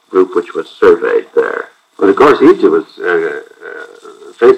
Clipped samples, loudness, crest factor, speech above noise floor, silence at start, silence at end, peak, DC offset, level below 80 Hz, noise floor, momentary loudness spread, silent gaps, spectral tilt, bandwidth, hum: 2%; -11 LUFS; 12 dB; 24 dB; 0.1 s; 0 s; 0 dBFS; under 0.1%; -52 dBFS; -35 dBFS; 21 LU; none; -6 dB/octave; 8.8 kHz; none